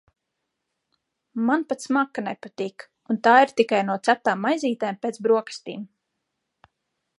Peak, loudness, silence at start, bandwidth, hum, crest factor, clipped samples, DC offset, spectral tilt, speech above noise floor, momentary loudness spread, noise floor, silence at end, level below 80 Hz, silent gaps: -2 dBFS; -23 LUFS; 1.35 s; 11.5 kHz; none; 22 dB; under 0.1%; under 0.1%; -5 dB/octave; 58 dB; 18 LU; -80 dBFS; 1.35 s; -78 dBFS; none